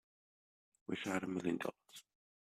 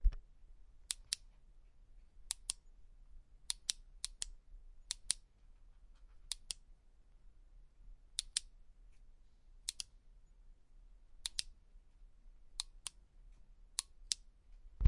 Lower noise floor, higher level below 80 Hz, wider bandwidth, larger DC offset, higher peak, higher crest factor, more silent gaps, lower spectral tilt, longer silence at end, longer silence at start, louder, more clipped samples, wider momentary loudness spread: first, under -90 dBFS vs -63 dBFS; second, -80 dBFS vs -50 dBFS; first, 15 kHz vs 11.5 kHz; neither; second, -24 dBFS vs -10 dBFS; second, 20 dB vs 34 dB; neither; first, -5 dB/octave vs -1 dB/octave; first, 0.5 s vs 0 s; first, 0.9 s vs 0 s; about the same, -41 LUFS vs -43 LUFS; neither; first, 19 LU vs 10 LU